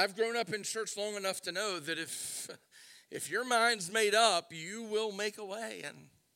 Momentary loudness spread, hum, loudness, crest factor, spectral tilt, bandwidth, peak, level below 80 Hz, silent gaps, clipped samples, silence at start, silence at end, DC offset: 14 LU; none; -33 LUFS; 20 dB; -1.5 dB/octave; 16.5 kHz; -14 dBFS; -88 dBFS; none; under 0.1%; 0 s; 0.3 s; under 0.1%